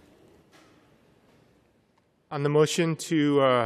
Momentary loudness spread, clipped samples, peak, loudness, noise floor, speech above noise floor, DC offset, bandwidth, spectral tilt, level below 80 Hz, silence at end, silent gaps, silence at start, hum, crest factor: 8 LU; under 0.1%; -8 dBFS; -24 LUFS; -67 dBFS; 44 dB; under 0.1%; 14 kHz; -5.5 dB/octave; -74 dBFS; 0 s; none; 2.3 s; none; 18 dB